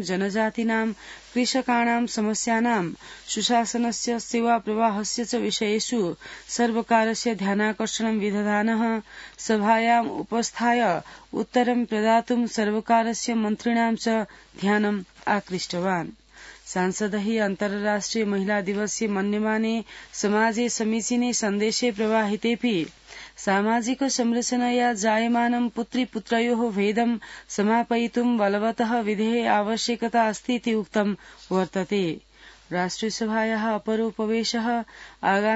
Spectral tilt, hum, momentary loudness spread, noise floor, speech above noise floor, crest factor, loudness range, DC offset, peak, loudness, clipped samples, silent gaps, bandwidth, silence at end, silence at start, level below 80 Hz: -4 dB/octave; none; 7 LU; -46 dBFS; 22 dB; 18 dB; 3 LU; under 0.1%; -6 dBFS; -24 LUFS; under 0.1%; none; 8 kHz; 0 s; 0 s; -60 dBFS